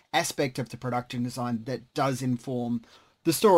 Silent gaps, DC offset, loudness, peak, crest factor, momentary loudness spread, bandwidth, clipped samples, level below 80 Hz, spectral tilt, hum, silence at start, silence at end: none; under 0.1%; -30 LUFS; -8 dBFS; 20 dB; 6 LU; 16 kHz; under 0.1%; -64 dBFS; -5 dB/octave; none; 0.15 s; 0 s